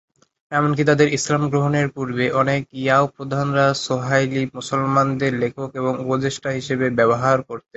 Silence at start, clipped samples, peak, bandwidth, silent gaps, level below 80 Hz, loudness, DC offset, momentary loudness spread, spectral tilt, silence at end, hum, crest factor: 0.5 s; under 0.1%; -2 dBFS; 8.2 kHz; none; -56 dBFS; -20 LUFS; under 0.1%; 7 LU; -5.5 dB/octave; 0.2 s; none; 18 dB